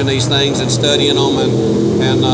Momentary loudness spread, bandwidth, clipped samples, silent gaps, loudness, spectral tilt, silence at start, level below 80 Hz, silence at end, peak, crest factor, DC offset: 2 LU; 8 kHz; under 0.1%; none; -13 LUFS; -5 dB/octave; 0 s; -38 dBFS; 0 s; 0 dBFS; 12 dB; under 0.1%